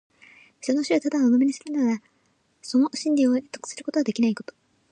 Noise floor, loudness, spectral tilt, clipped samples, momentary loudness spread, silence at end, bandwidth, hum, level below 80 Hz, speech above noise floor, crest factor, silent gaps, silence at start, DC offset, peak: -67 dBFS; -24 LUFS; -4.5 dB/octave; under 0.1%; 13 LU; 0.5 s; 9.8 kHz; none; -76 dBFS; 44 dB; 14 dB; none; 0.65 s; under 0.1%; -10 dBFS